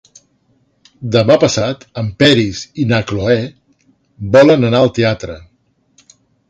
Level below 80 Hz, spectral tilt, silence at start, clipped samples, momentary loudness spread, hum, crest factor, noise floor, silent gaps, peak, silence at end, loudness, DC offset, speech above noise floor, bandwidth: -42 dBFS; -5.5 dB/octave; 1 s; under 0.1%; 18 LU; none; 14 dB; -59 dBFS; none; 0 dBFS; 1.1 s; -13 LUFS; under 0.1%; 47 dB; 9 kHz